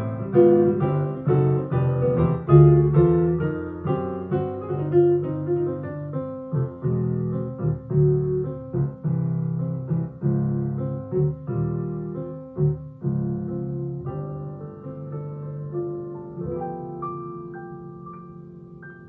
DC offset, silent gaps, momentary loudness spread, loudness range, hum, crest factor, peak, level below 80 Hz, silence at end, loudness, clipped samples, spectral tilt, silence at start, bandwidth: under 0.1%; none; 17 LU; 13 LU; none; 20 dB; -4 dBFS; -48 dBFS; 0 s; -23 LUFS; under 0.1%; -14 dB/octave; 0 s; 3.4 kHz